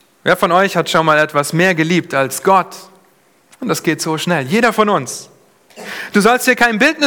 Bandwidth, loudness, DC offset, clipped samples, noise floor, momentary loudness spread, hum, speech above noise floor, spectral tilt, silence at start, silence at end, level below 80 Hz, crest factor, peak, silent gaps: over 20 kHz; -14 LUFS; under 0.1%; under 0.1%; -53 dBFS; 15 LU; none; 39 dB; -4 dB/octave; 0.25 s; 0 s; -56 dBFS; 16 dB; 0 dBFS; none